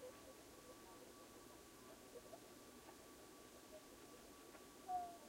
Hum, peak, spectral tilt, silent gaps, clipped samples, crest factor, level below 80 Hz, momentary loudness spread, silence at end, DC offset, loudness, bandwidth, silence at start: none; -38 dBFS; -3 dB/octave; none; under 0.1%; 20 dB; -78 dBFS; 8 LU; 0 s; under 0.1%; -58 LUFS; 16 kHz; 0 s